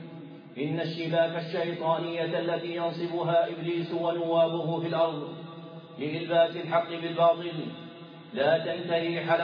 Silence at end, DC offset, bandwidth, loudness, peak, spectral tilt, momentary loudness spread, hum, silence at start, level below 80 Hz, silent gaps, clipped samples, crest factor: 0 s; under 0.1%; 5.2 kHz; -28 LUFS; -12 dBFS; -8.5 dB/octave; 17 LU; none; 0 s; -84 dBFS; none; under 0.1%; 16 dB